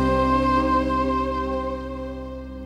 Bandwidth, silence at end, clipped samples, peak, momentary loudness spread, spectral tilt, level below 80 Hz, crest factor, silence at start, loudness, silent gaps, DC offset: 10.5 kHz; 0 s; under 0.1%; -10 dBFS; 13 LU; -7.5 dB/octave; -34 dBFS; 14 dB; 0 s; -23 LUFS; none; under 0.1%